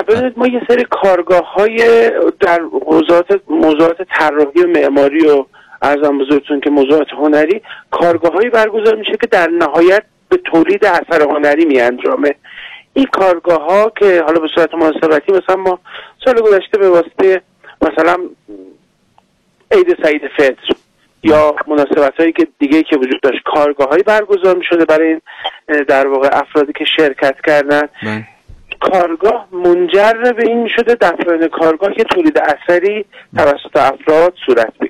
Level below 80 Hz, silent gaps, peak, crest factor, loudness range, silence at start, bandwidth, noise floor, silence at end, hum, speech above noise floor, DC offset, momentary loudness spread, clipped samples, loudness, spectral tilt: -48 dBFS; none; -4 dBFS; 8 dB; 2 LU; 0 s; 12 kHz; -56 dBFS; 0 s; none; 45 dB; under 0.1%; 7 LU; under 0.1%; -12 LUFS; -5.5 dB/octave